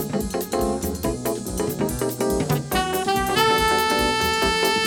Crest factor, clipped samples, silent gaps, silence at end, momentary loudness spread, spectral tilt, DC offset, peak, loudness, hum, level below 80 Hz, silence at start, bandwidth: 18 dB; under 0.1%; none; 0 s; 7 LU; -3.5 dB/octave; under 0.1%; -4 dBFS; -22 LUFS; none; -38 dBFS; 0 s; over 20 kHz